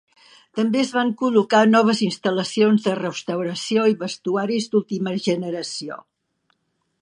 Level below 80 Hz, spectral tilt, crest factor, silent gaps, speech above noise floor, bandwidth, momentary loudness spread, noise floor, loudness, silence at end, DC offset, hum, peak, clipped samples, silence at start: -72 dBFS; -5 dB/octave; 18 dB; none; 51 dB; 11 kHz; 11 LU; -71 dBFS; -21 LUFS; 1.05 s; under 0.1%; none; -2 dBFS; under 0.1%; 0.55 s